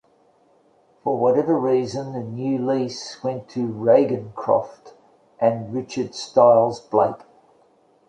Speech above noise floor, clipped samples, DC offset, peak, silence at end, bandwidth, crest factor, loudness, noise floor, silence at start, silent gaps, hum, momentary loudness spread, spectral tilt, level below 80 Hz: 38 dB; under 0.1%; under 0.1%; -2 dBFS; 0.95 s; 9.2 kHz; 20 dB; -21 LUFS; -59 dBFS; 1.05 s; none; none; 12 LU; -6.5 dB/octave; -64 dBFS